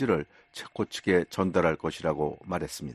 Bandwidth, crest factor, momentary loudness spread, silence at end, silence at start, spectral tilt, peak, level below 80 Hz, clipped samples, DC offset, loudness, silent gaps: 13 kHz; 20 dB; 12 LU; 0 s; 0 s; -5.5 dB/octave; -8 dBFS; -54 dBFS; under 0.1%; under 0.1%; -29 LUFS; none